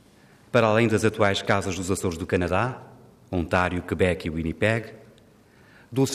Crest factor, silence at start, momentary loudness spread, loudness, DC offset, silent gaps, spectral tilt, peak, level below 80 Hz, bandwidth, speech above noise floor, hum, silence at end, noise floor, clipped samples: 20 dB; 0.55 s; 9 LU; -24 LUFS; under 0.1%; none; -5.5 dB/octave; -6 dBFS; -52 dBFS; 15.5 kHz; 31 dB; none; 0 s; -54 dBFS; under 0.1%